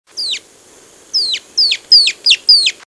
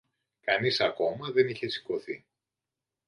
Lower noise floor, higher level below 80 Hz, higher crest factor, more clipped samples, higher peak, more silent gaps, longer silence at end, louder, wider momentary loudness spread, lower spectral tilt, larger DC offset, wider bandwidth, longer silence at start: second, -44 dBFS vs -89 dBFS; first, -58 dBFS vs -72 dBFS; second, 14 dB vs 22 dB; neither; first, 0 dBFS vs -10 dBFS; neither; second, 0.15 s vs 0.9 s; first, -10 LUFS vs -29 LUFS; about the same, 12 LU vs 11 LU; second, 3 dB/octave vs -5.5 dB/octave; neither; about the same, 11 kHz vs 11 kHz; second, 0.15 s vs 0.45 s